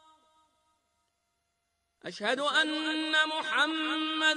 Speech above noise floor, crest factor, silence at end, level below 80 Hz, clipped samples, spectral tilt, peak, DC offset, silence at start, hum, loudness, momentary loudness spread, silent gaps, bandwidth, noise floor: 50 dB; 18 dB; 0 s; -84 dBFS; under 0.1%; -1.5 dB/octave; -14 dBFS; under 0.1%; 2.05 s; none; -28 LUFS; 7 LU; none; 10 kHz; -79 dBFS